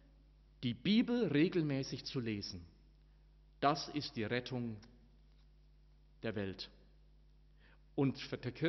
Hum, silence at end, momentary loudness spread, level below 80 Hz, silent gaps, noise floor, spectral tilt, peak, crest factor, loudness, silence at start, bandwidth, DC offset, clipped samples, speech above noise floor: none; 0 s; 13 LU; -64 dBFS; none; -64 dBFS; -5 dB/octave; -18 dBFS; 22 dB; -38 LUFS; 0.6 s; 6.2 kHz; under 0.1%; under 0.1%; 28 dB